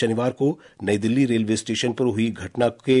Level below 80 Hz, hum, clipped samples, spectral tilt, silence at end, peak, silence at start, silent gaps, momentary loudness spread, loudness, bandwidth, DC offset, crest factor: -62 dBFS; none; under 0.1%; -5.5 dB/octave; 0 s; -8 dBFS; 0 s; none; 5 LU; -23 LUFS; 11 kHz; under 0.1%; 14 dB